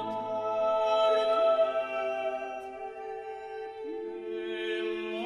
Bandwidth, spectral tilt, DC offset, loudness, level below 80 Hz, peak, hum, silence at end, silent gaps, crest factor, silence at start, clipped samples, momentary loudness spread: 10.5 kHz; -4.5 dB/octave; under 0.1%; -30 LUFS; -72 dBFS; -16 dBFS; none; 0 s; none; 14 dB; 0 s; under 0.1%; 15 LU